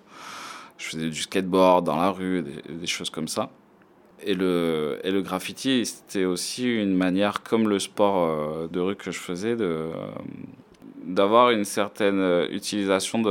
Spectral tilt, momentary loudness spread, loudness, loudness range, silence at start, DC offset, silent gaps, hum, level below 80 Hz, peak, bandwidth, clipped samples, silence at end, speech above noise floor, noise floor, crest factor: -4.5 dB/octave; 15 LU; -24 LUFS; 4 LU; 0.1 s; under 0.1%; none; none; -68 dBFS; -4 dBFS; 18 kHz; under 0.1%; 0 s; 31 dB; -55 dBFS; 20 dB